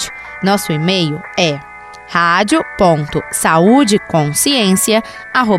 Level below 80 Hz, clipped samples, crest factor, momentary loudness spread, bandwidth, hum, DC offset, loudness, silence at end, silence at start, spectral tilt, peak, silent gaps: -44 dBFS; under 0.1%; 14 dB; 9 LU; 16 kHz; none; under 0.1%; -13 LUFS; 0 s; 0 s; -4 dB/octave; 0 dBFS; none